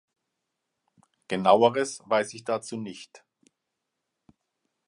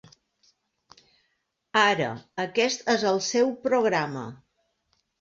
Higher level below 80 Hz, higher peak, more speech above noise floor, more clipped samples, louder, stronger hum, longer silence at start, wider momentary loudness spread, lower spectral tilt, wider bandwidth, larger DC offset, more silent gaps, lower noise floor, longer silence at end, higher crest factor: about the same, -74 dBFS vs -70 dBFS; about the same, -4 dBFS vs -6 dBFS; first, 58 dB vs 51 dB; neither; about the same, -25 LUFS vs -24 LUFS; neither; second, 1.3 s vs 1.75 s; first, 17 LU vs 11 LU; about the same, -4.5 dB/octave vs -3.5 dB/octave; first, 11.5 kHz vs 7.8 kHz; neither; neither; first, -83 dBFS vs -76 dBFS; first, 1.7 s vs 0.85 s; about the same, 24 dB vs 22 dB